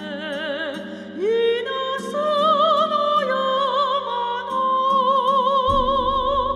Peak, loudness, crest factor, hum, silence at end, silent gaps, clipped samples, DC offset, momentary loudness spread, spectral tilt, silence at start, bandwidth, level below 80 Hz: -8 dBFS; -20 LUFS; 14 dB; none; 0 s; none; under 0.1%; under 0.1%; 9 LU; -4.5 dB/octave; 0 s; 11.5 kHz; -42 dBFS